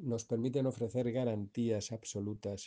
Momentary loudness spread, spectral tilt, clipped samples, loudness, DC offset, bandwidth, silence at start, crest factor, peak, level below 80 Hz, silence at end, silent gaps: 6 LU; -6.5 dB/octave; under 0.1%; -37 LUFS; under 0.1%; 10 kHz; 0 s; 14 dB; -22 dBFS; -70 dBFS; 0 s; none